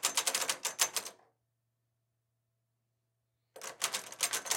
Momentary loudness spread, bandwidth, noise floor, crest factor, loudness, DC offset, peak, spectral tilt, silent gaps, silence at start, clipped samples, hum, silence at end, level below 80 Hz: 16 LU; 17 kHz; -83 dBFS; 28 dB; -33 LUFS; under 0.1%; -10 dBFS; 2 dB/octave; none; 0 s; under 0.1%; none; 0 s; under -90 dBFS